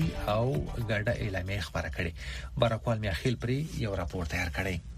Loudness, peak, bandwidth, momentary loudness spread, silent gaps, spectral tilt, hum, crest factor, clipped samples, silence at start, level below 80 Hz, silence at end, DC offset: -32 LUFS; -10 dBFS; 15.5 kHz; 5 LU; none; -6 dB/octave; none; 20 dB; under 0.1%; 0 s; -42 dBFS; 0 s; under 0.1%